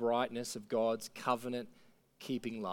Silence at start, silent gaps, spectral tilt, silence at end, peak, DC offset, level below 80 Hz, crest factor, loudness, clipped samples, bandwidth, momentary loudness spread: 0 s; none; -4.5 dB/octave; 0 s; -18 dBFS; under 0.1%; -76 dBFS; 18 dB; -37 LUFS; under 0.1%; 18.5 kHz; 9 LU